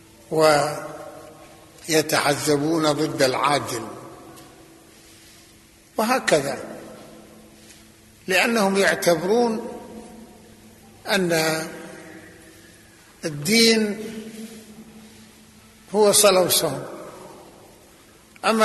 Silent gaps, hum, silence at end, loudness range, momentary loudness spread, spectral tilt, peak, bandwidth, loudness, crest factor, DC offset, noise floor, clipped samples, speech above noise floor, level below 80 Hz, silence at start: none; none; 0 s; 6 LU; 24 LU; -3 dB/octave; -4 dBFS; 12.5 kHz; -20 LUFS; 20 dB; under 0.1%; -51 dBFS; under 0.1%; 31 dB; -60 dBFS; 0.3 s